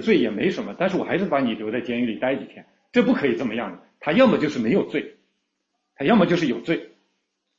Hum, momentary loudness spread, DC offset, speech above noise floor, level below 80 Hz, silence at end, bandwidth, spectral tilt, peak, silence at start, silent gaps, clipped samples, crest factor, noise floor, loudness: none; 11 LU; under 0.1%; 55 dB; -62 dBFS; 0.7 s; 7.6 kHz; -7 dB/octave; -4 dBFS; 0 s; none; under 0.1%; 18 dB; -76 dBFS; -22 LUFS